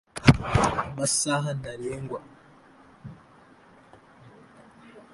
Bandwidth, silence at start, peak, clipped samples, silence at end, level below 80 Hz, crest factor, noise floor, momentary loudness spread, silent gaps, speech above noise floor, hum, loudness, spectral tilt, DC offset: 11.5 kHz; 0.15 s; 0 dBFS; under 0.1%; 0.15 s; -44 dBFS; 28 dB; -54 dBFS; 26 LU; none; 26 dB; none; -25 LUFS; -4.5 dB/octave; under 0.1%